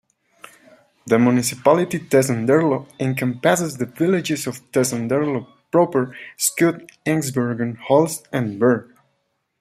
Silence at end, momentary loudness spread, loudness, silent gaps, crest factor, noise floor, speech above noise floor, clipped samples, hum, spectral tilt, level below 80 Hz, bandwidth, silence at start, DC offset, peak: 0.8 s; 7 LU; -20 LUFS; none; 18 dB; -71 dBFS; 52 dB; under 0.1%; none; -5 dB/octave; -62 dBFS; 16 kHz; 1.05 s; under 0.1%; -2 dBFS